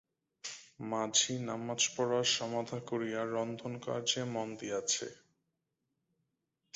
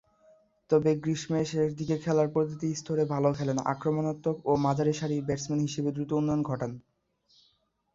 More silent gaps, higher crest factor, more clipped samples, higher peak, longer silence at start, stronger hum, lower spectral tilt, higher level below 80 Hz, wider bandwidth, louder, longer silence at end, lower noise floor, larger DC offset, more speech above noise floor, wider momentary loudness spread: neither; about the same, 22 dB vs 18 dB; neither; second, -16 dBFS vs -12 dBFS; second, 0.45 s vs 0.7 s; neither; second, -3 dB/octave vs -7 dB/octave; second, -78 dBFS vs -62 dBFS; about the same, 8 kHz vs 7.8 kHz; second, -34 LUFS vs -29 LUFS; first, 1.6 s vs 1.15 s; first, -85 dBFS vs -71 dBFS; neither; first, 50 dB vs 43 dB; first, 15 LU vs 5 LU